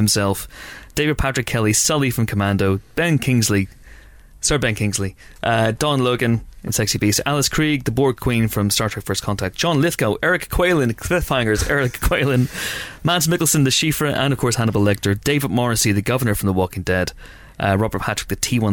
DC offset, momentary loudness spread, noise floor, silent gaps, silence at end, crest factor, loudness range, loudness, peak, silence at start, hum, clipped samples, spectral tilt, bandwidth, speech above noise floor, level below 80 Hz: under 0.1%; 6 LU; -43 dBFS; none; 0 s; 14 dB; 2 LU; -19 LUFS; -6 dBFS; 0 s; none; under 0.1%; -4.5 dB/octave; 19.5 kHz; 24 dB; -36 dBFS